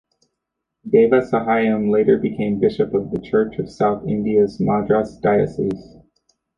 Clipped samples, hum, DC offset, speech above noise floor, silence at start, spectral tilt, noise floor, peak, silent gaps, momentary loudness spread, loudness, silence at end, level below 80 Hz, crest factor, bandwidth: under 0.1%; none; under 0.1%; 61 dB; 0.85 s; -8.5 dB/octave; -79 dBFS; -2 dBFS; none; 7 LU; -19 LUFS; 0.75 s; -50 dBFS; 16 dB; 7.2 kHz